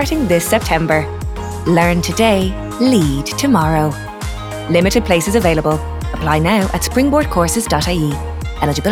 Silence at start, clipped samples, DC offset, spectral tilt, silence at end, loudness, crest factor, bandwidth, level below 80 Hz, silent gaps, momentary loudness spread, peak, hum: 0 s; under 0.1%; under 0.1%; -5 dB/octave; 0 s; -15 LUFS; 14 dB; 18.5 kHz; -28 dBFS; none; 10 LU; 0 dBFS; none